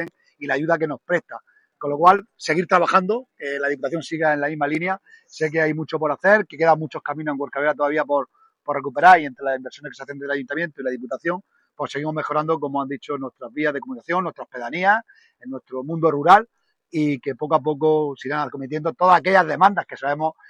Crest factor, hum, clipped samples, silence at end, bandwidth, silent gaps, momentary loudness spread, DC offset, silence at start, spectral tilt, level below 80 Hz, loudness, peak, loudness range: 22 dB; none; under 0.1%; 0.2 s; 11 kHz; none; 15 LU; under 0.1%; 0 s; -6 dB/octave; -68 dBFS; -21 LUFS; 0 dBFS; 6 LU